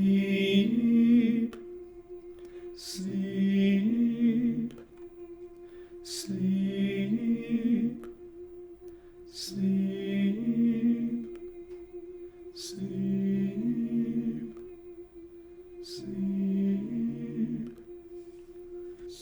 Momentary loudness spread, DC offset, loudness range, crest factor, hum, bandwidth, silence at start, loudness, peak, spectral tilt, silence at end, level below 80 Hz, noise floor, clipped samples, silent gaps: 22 LU; under 0.1%; 5 LU; 18 dB; none; over 20 kHz; 0 s; -29 LUFS; -12 dBFS; -6.5 dB/octave; 0 s; -62 dBFS; -49 dBFS; under 0.1%; none